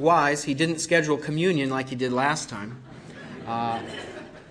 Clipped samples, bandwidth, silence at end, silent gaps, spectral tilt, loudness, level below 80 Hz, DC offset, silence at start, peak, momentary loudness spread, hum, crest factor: under 0.1%; 11 kHz; 0 s; none; -4.5 dB/octave; -25 LUFS; -60 dBFS; under 0.1%; 0 s; -6 dBFS; 19 LU; none; 20 dB